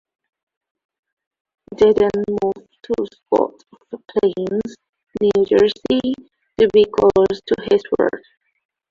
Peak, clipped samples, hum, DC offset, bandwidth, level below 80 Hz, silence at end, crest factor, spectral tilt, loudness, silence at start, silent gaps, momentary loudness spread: -2 dBFS; under 0.1%; none; under 0.1%; 7.4 kHz; -50 dBFS; 0.7 s; 16 dB; -6.5 dB/octave; -18 LUFS; 1.7 s; 4.89-4.93 s; 18 LU